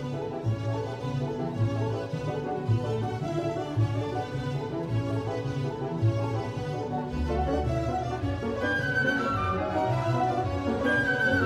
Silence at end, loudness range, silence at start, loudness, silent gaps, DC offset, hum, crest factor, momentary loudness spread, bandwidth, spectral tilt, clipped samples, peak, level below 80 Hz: 0 s; 3 LU; 0 s; -29 LUFS; none; under 0.1%; none; 16 dB; 6 LU; 10.5 kHz; -7 dB/octave; under 0.1%; -12 dBFS; -44 dBFS